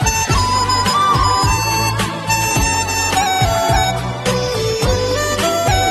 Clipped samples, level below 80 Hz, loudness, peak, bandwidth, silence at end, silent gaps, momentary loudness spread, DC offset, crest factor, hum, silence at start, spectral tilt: under 0.1%; -26 dBFS; -15 LUFS; -2 dBFS; 13 kHz; 0 s; none; 4 LU; under 0.1%; 14 dB; none; 0 s; -3.5 dB/octave